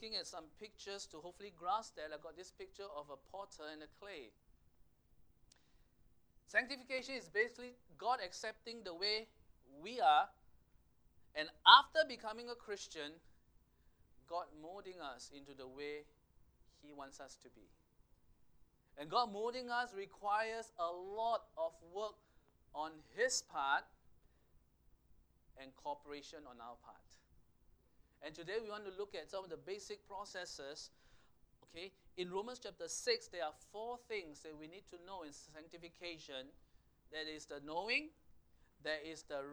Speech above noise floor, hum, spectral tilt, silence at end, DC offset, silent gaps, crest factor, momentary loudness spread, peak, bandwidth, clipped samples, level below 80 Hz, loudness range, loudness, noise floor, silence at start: 30 dB; none; -1 dB/octave; 0 s; under 0.1%; none; 34 dB; 17 LU; -10 dBFS; over 20 kHz; under 0.1%; -74 dBFS; 20 LU; -40 LUFS; -71 dBFS; 0 s